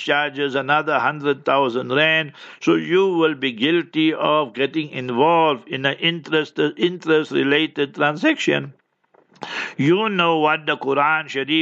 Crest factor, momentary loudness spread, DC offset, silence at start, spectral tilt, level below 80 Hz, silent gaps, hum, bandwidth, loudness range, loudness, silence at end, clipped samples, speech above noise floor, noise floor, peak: 18 dB; 6 LU; under 0.1%; 0 s; -5.5 dB/octave; -74 dBFS; none; none; 7.8 kHz; 2 LU; -19 LUFS; 0 s; under 0.1%; 40 dB; -59 dBFS; -2 dBFS